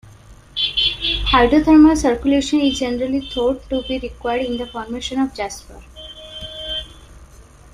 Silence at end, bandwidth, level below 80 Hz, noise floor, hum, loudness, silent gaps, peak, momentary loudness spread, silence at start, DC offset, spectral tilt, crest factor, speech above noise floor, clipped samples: 0.3 s; 11.5 kHz; -34 dBFS; -43 dBFS; none; -18 LUFS; none; -2 dBFS; 19 LU; 0.3 s; under 0.1%; -4 dB/octave; 18 dB; 26 dB; under 0.1%